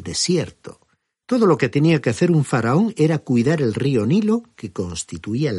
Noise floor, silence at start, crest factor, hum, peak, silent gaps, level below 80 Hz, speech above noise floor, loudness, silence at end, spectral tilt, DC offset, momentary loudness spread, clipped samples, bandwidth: -65 dBFS; 0 s; 16 dB; none; -4 dBFS; none; -54 dBFS; 47 dB; -19 LUFS; 0 s; -6 dB/octave; under 0.1%; 10 LU; under 0.1%; 11.5 kHz